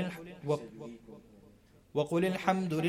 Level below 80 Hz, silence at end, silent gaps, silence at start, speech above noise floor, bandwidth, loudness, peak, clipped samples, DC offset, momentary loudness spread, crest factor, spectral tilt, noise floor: -68 dBFS; 0 s; none; 0 s; 30 dB; 15.5 kHz; -33 LUFS; -12 dBFS; under 0.1%; under 0.1%; 22 LU; 22 dB; -6.5 dB/octave; -60 dBFS